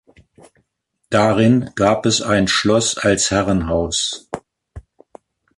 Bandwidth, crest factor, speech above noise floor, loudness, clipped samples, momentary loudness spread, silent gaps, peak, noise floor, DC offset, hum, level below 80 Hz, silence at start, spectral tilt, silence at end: 11.5 kHz; 16 dB; 55 dB; -16 LUFS; under 0.1%; 7 LU; none; -2 dBFS; -71 dBFS; under 0.1%; none; -40 dBFS; 1.1 s; -4 dB/octave; 0.8 s